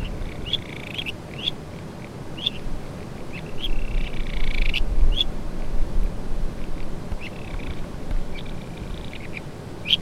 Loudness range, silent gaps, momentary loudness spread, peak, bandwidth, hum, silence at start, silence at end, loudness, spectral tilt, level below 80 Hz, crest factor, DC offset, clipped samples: 6 LU; none; 10 LU; -4 dBFS; 10 kHz; none; 0 s; 0 s; -30 LUFS; -4.5 dB/octave; -26 dBFS; 18 dB; under 0.1%; under 0.1%